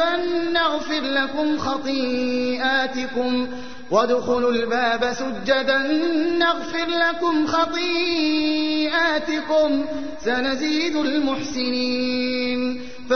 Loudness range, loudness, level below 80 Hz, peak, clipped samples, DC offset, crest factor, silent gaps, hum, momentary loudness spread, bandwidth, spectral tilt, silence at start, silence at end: 2 LU; -21 LUFS; -52 dBFS; -6 dBFS; under 0.1%; 2%; 16 dB; none; none; 5 LU; 6.6 kHz; -3.5 dB/octave; 0 s; 0 s